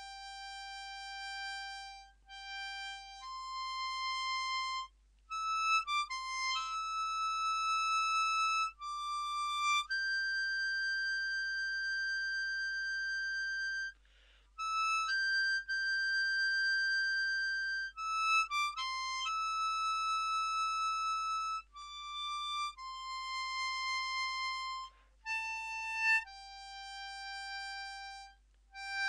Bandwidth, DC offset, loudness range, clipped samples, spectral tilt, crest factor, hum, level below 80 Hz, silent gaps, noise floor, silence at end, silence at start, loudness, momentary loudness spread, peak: 12.5 kHz; under 0.1%; 6 LU; under 0.1%; 3.5 dB/octave; 16 dB; none; -66 dBFS; none; -64 dBFS; 0 s; 0 s; -35 LUFS; 14 LU; -20 dBFS